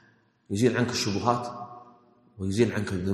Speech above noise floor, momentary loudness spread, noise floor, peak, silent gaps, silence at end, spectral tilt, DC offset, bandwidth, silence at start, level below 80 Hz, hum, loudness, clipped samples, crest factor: 31 dB; 13 LU; -57 dBFS; -8 dBFS; none; 0 s; -5.5 dB/octave; under 0.1%; 13 kHz; 0.5 s; -62 dBFS; none; -27 LUFS; under 0.1%; 20 dB